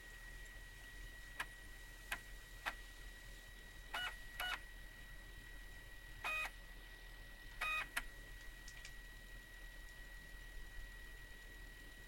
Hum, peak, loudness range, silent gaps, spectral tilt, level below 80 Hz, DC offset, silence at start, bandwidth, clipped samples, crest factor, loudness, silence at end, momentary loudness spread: none; -24 dBFS; 9 LU; none; -2 dB/octave; -56 dBFS; under 0.1%; 0 s; 16.5 kHz; under 0.1%; 26 dB; -49 LUFS; 0 s; 13 LU